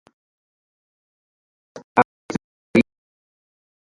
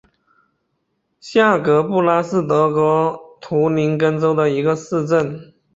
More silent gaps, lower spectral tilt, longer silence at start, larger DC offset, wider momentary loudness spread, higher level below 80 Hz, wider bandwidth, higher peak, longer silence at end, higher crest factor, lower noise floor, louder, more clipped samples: first, 1.84-1.96 s, 2.05-2.29 s, 2.44-2.74 s vs none; about the same, -6.5 dB/octave vs -7 dB/octave; first, 1.75 s vs 1.25 s; neither; first, 11 LU vs 7 LU; about the same, -58 dBFS vs -58 dBFS; first, 11.5 kHz vs 7.8 kHz; about the same, 0 dBFS vs -2 dBFS; first, 1.1 s vs 0.3 s; first, 26 dB vs 16 dB; first, under -90 dBFS vs -70 dBFS; second, -22 LUFS vs -17 LUFS; neither